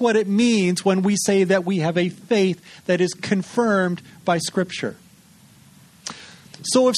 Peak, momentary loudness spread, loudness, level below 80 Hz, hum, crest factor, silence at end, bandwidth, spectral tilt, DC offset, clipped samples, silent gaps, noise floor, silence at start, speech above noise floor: -4 dBFS; 14 LU; -21 LUFS; -64 dBFS; none; 16 dB; 0 s; 13 kHz; -5 dB/octave; under 0.1%; under 0.1%; none; -51 dBFS; 0 s; 31 dB